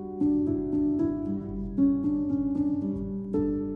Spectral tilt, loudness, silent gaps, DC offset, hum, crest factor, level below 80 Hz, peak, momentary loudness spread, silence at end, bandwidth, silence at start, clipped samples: -12 dB/octave; -28 LUFS; none; under 0.1%; none; 14 dB; -46 dBFS; -14 dBFS; 7 LU; 0 s; 1.9 kHz; 0 s; under 0.1%